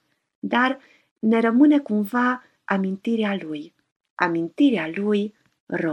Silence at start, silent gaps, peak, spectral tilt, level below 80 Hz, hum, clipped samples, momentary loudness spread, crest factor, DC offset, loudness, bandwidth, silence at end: 0.45 s; 1.11-1.16 s, 3.92-4.00 s, 4.10-4.17 s, 5.60-5.67 s; -2 dBFS; -7 dB/octave; -76 dBFS; none; under 0.1%; 14 LU; 20 dB; under 0.1%; -22 LUFS; 13 kHz; 0 s